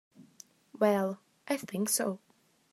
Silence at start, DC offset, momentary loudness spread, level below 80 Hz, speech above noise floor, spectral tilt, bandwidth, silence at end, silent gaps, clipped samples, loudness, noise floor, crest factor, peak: 0.2 s; under 0.1%; 17 LU; -82 dBFS; 28 dB; -4 dB/octave; 14.5 kHz; 0.55 s; none; under 0.1%; -31 LUFS; -58 dBFS; 22 dB; -12 dBFS